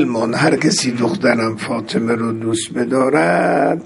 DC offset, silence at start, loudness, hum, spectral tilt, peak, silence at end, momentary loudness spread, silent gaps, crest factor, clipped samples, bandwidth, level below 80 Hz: under 0.1%; 0 s; -16 LUFS; none; -4.5 dB/octave; 0 dBFS; 0 s; 6 LU; none; 16 dB; under 0.1%; 11.5 kHz; -56 dBFS